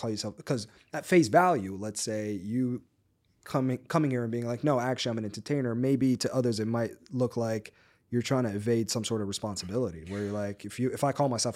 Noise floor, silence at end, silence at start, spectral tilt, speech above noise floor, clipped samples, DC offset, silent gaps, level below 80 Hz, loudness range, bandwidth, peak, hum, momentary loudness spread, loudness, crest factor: -70 dBFS; 0 s; 0 s; -5.5 dB/octave; 41 dB; under 0.1%; under 0.1%; none; -66 dBFS; 3 LU; 16 kHz; -10 dBFS; none; 9 LU; -30 LUFS; 20 dB